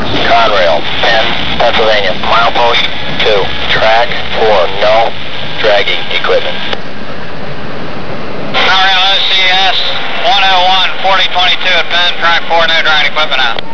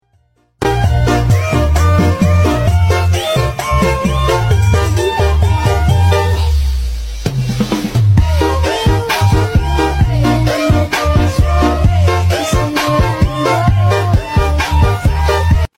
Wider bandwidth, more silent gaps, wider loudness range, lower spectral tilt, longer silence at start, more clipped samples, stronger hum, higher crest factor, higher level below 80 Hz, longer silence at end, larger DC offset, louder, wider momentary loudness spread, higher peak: second, 5.4 kHz vs 16 kHz; neither; first, 5 LU vs 1 LU; second, -3.5 dB/octave vs -6 dB/octave; second, 0 s vs 0.6 s; first, 0.2% vs under 0.1%; neither; about the same, 10 dB vs 12 dB; second, -36 dBFS vs -20 dBFS; about the same, 0 s vs 0.1 s; first, 30% vs under 0.1%; first, -9 LUFS vs -13 LUFS; first, 13 LU vs 4 LU; about the same, 0 dBFS vs 0 dBFS